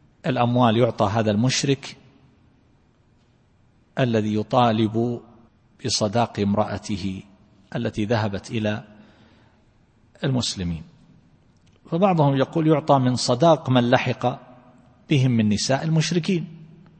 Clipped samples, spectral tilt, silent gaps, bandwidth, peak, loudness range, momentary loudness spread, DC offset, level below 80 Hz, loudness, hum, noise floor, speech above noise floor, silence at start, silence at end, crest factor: under 0.1%; -5.5 dB/octave; none; 8.8 kHz; -2 dBFS; 9 LU; 11 LU; under 0.1%; -54 dBFS; -22 LUFS; none; -59 dBFS; 38 dB; 0.25 s; 0.35 s; 20 dB